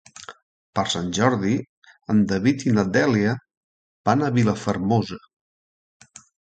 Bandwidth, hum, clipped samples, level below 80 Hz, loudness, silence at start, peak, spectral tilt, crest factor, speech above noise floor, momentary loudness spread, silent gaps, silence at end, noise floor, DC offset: 9.2 kHz; none; under 0.1%; -54 dBFS; -22 LUFS; 0.3 s; -2 dBFS; -6 dB/octave; 20 dB; over 69 dB; 16 LU; 0.42-0.73 s, 1.69-1.82 s, 3.57-4.04 s; 1.35 s; under -90 dBFS; under 0.1%